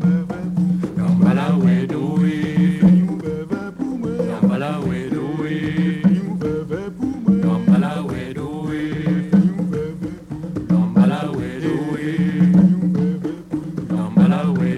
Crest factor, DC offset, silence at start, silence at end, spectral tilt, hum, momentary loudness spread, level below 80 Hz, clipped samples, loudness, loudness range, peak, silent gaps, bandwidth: 16 dB; under 0.1%; 0 s; 0 s; -9 dB/octave; none; 11 LU; -46 dBFS; under 0.1%; -19 LUFS; 4 LU; -2 dBFS; none; 9.6 kHz